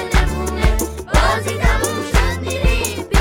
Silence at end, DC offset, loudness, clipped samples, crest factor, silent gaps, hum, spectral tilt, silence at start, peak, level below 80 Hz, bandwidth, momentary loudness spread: 0 s; under 0.1%; -18 LUFS; under 0.1%; 16 dB; none; none; -4.5 dB/octave; 0 s; 0 dBFS; -18 dBFS; 17.5 kHz; 4 LU